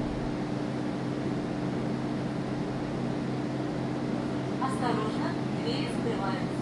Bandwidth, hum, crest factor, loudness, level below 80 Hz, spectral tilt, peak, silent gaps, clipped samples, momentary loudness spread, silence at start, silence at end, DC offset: 11.5 kHz; none; 14 dB; -31 LUFS; -52 dBFS; -7 dB/octave; -16 dBFS; none; under 0.1%; 3 LU; 0 s; 0 s; under 0.1%